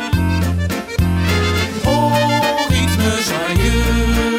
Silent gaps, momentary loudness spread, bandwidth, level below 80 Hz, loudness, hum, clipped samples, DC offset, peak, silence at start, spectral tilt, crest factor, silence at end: none; 4 LU; 16.5 kHz; -24 dBFS; -16 LUFS; none; under 0.1%; under 0.1%; -2 dBFS; 0 s; -5 dB/octave; 14 dB; 0 s